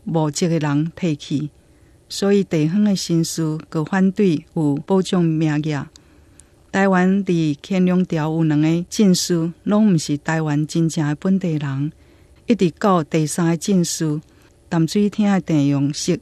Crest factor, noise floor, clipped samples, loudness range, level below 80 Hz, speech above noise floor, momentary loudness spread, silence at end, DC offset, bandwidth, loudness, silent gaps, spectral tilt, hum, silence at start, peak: 14 dB; -51 dBFS; under 0.1%; 2 LU; -54 dBFS; 33 dB; 8 LU; 0 s; under 0.1%; 13.5 kHz; -19 LUFS; none; -6 dB/octave; none; 0.05 s; -4 dBFS